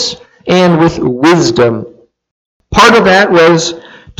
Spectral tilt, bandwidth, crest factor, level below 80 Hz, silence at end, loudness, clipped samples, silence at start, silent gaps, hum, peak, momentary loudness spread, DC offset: -4.5 dB/octave; 14.5 kHz; 10 dB; -36 dBFS; 0.4 s; -8 LUFS; 0.3%; 0 s; 2.31-2.60 s; none; 0 dBFS; 12 LU; under 0.1%